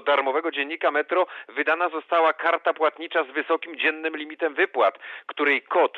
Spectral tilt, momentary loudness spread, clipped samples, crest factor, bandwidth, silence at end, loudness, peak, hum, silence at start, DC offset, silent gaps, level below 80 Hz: -4 dB/octave; 7 LU; under 0.1%; 16 dB; 6 kHz; 0 s; -24 LUFS; -8 dBFS; none; 0 s; under 0.1%; none; under -90 dBFS